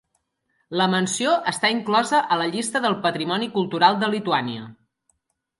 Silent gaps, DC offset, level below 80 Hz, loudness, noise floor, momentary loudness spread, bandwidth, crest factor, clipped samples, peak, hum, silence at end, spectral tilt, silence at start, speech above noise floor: none; under 0.1%; -70 dBFS; -21 LUFS; -72 dBFS; 6 LU; 11.5 kHz; 20 dB; under 0.1%; -4 dBFS; none; 0.85 s; -3.5 dB/octave; 0.7 s; 51 dB